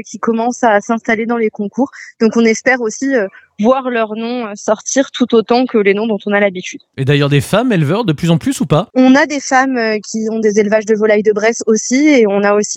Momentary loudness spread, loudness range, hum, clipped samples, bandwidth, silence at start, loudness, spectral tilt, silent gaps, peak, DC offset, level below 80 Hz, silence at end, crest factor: 8 LU; 2 LU; none; under 0.1%; 15.5 kHz; 0.05 s; -13 LUFS; -5 dB/octave; none; 0 dBFS; under 0.1%; -54 dBFS; 0 s; 12 dB